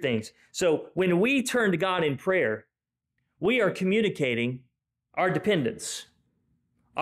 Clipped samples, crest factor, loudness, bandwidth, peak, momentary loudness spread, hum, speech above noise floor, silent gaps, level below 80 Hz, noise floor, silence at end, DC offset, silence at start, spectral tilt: under 0.1%; 12 dB; -26 LUFS; 15.5 kHz; -14 dBFS; 12 LU; none; 57 dB; none; -66 dBFS; -83 dBFS; 0 s; under 0.1%; 0 s; -5 dB/octave